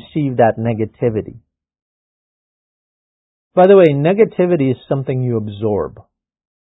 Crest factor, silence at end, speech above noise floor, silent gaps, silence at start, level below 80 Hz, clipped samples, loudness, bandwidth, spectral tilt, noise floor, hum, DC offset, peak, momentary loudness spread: 16 dB; 0.75 s; over 76 dB; 1.82-3.51 s; 0.15 s; -50 dBFS; under 0.1%; -15 LUFS; 4 kHz; -10.5 dB/octave; under -90 dBFS; none; under 0.1%; 0 dBFS; 11 LU